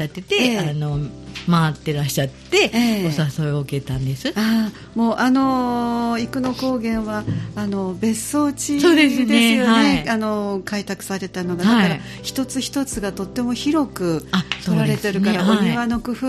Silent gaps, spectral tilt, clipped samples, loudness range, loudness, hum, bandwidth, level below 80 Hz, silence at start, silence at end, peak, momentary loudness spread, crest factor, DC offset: none; -5 dB/octave; under 0.1%; 5 LU; -20 LUFS; none; 14.5 kHz; -44 dBFS; 0 s; 0 s; -2 dBFS; 10 LU; 16 dB; under 0.1%